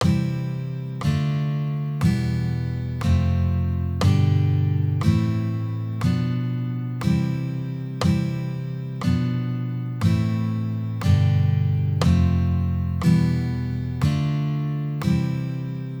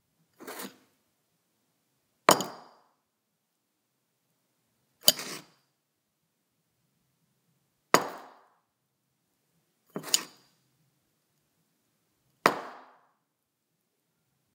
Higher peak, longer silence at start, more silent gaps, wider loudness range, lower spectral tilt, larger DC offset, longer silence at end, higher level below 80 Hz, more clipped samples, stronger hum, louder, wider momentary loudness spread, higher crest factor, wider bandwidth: second, -6 dBFS vs 0 dBFS; second, 0 s vs 0.4 s; neither; about the same, 4 LU vs 4 LU; first, -8 dB/octave vs -1.5 dB/octave; neither; second, 0 s vs 1.75 s; first, -38 dBFS vs -84 dBFS; neither; neither; first, -23 LUFS vs -27 LUFS; second, 8 LU vs 22 LU; second, 16 dB vs 36 dB; first, 18.5 kHz vs 16 kHz